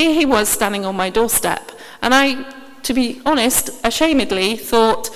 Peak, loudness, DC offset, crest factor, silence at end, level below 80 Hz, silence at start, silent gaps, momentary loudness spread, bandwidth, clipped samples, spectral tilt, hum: 0 dBFS; -16 LUFS; under 0.1%; 16 dB; 0 s; -42 dBFS; 0 s; none; 10 LU; 16 kHz; under 0.1%; -2.5 dB/octave; none